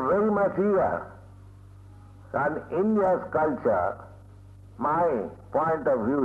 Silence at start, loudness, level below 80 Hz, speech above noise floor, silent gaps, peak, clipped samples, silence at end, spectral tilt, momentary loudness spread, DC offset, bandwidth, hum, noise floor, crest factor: 0 s; -26 LUFS; -56 dBFS; 23 dB; none; -14 dBFS; under 0.1%; 0 s; -9.5 dB/octave; 8 LU; under 0.1%; 7.6 kHz; none; -48 dBFS; 12 dB